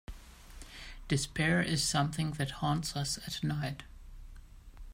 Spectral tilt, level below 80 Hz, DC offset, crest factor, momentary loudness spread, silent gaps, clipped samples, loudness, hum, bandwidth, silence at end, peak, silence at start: -4 dB/octave; -50 dBFS; under 0.1%; 18 dB; 23 LU; none; under 0.1%; -33 LUFS; none; 16 kHz; 0 s; -16 dBFS; 0.1 s